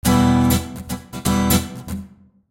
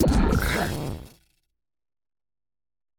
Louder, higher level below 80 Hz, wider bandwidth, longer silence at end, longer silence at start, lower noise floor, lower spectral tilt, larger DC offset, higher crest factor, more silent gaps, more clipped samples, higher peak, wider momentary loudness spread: first, -19 LUFS vs -25 LUFS; about the same, -32 dBFS vs -32 dBFS; second, 17 kHz vs 19.5 kHz; second, 0.45 s vs 1.9 s; about the same, 0.05 s vs 0 s; second, -42 dBFS vs -77 dBFS; about the same, -5 dB/octave vs -6 dB/octave; neither; about the same, 16 dB vs 20 dB; neither; neither; first, -2 dBFS vs -8 dBFS; about the same, 16 LU vs 14 LU